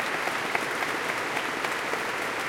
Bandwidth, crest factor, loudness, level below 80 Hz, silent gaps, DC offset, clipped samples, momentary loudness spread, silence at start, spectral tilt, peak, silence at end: 17 kHz; 20 dB; -28 LUFS; -66 dBFS; none; under 0.1%; under 0.1%; 1 LU; 0 s; -2 dB/octave; -10 dBFS; 0 s